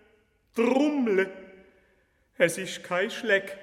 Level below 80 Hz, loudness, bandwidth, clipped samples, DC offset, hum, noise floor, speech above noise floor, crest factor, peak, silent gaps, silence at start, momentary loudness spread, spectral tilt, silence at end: -72 dBFS; -26 LUFS; 16 kHz; under 0.1%; under 0.1%; none; -67 dBFS; 41 dB; 20 dB; -8 dBFS; none; 0.55 s; 10 LU; -4 dB/octave; 0 s